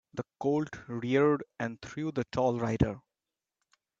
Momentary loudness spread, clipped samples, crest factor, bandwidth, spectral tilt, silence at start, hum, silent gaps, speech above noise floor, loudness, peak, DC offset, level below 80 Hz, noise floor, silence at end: 11 LU; under 0.1%; 20 dB; 7.8 kHz; -7.5 dB/octave; 0.15 s; none; none; over 60 dB; -31 LUFS; -12 dBFS; under 0.1%; -54 dBFS; under -90 dBFS; 1 s